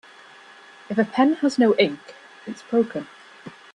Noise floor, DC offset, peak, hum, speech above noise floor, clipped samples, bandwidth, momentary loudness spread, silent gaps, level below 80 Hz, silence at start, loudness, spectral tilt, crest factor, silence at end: -47 dBFS; under 0.1%; -6 dBFS; none; 26 dB; under 0.1%; 10.5 kHz; 23 LU; none; -70 dBFS; 0.9 s; -21 LUFS; -5.5 dB/octave; 18 dB; 0.25 s